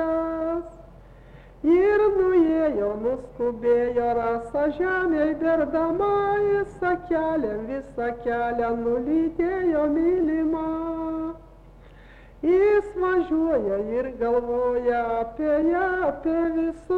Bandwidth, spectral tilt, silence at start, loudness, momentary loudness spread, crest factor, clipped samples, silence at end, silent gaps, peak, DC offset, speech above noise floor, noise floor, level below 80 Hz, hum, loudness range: 4.8 kHz; -8 dB/octave; 0 s; -24 LUFS; 9 LU; 12 dB; under 0.1%; 0 s; none; -10 dBFS; under 0.1%; 25 dB; -47 dBFS; -48 dBFS; none; 3 LU